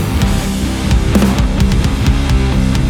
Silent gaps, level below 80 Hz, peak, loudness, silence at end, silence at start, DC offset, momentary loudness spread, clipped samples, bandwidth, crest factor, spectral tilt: none; -16 dBFS; 0 dBFS; -14 LUFS; 0 s; 0 s; under 0.1%; 4 LU; under 0.1%; 17.5 kHz; 12 dB; -6 dB/octave